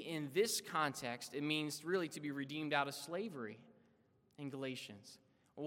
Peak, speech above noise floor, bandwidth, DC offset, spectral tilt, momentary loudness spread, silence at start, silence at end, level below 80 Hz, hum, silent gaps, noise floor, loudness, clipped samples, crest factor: -20 dBFS; 33 dB; 17 kHz; under 0.1%; -3.5 dB/octave; 15 LU; 0 s; 0 s; -88 dBFS; none; none; -74 dBFS; -41 LUFS; under 0.1%; 22 dB